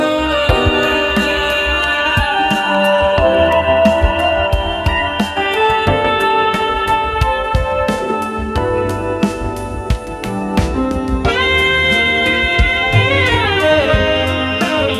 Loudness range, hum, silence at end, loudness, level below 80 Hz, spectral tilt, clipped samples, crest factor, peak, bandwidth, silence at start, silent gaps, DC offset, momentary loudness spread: 5 LU; none; 0 s; -14 LUFS; -24 dBFS; -5 dB/octave; under 0.1%; 14 dB; 0 dBFS; 15.5 kHz; 0 s; none; under 0.1%; 7 LU